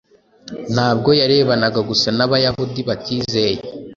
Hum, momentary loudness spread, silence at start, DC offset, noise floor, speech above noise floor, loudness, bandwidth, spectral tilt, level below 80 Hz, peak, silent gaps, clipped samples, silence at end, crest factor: none; 9 LU; 0.45 s; under 0.1%; -40 dBFS; 24 dB; -17 LUFS; 7.4 kHz; -5.5 dB/octave; -48 dBFS; 0 dBFS; none; under 0.1%; 0 s; 18 dB